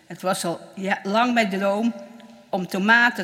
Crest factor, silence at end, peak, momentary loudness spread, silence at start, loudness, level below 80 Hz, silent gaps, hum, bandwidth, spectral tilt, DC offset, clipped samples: 20 dB; 0 s; -2 dBFS; 13 LU; 0.1 s; -22 LUFS; -76 dBFS; none; none; 16 kHz; -4.5 dB/octave; under 0.1%; under 0.1%